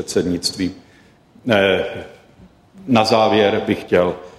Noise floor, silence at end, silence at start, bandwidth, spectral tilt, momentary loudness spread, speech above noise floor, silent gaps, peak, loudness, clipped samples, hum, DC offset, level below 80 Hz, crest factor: -50 dBFS; 0.1 s; 0 s; 15 kHz; -4.5 dB/octave; 13 LU; 33 dB; none; -2 dBFS; -17 LUFS; under 0.1%; none; under 0.1%; -52 dBFS; 16 dB